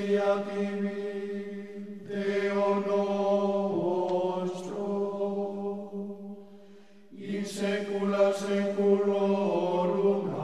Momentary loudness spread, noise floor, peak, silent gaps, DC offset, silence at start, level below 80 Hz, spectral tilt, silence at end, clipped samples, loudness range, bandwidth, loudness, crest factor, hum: 13 LU; -54 dBFS; -12 dBFS; none; 0.2%; 0 s; -72 dBFS; -6.5 dB/octave; 0 s; under 0.1%; 7 LU; 12 kHz; -29 LUFS; 16 dB; none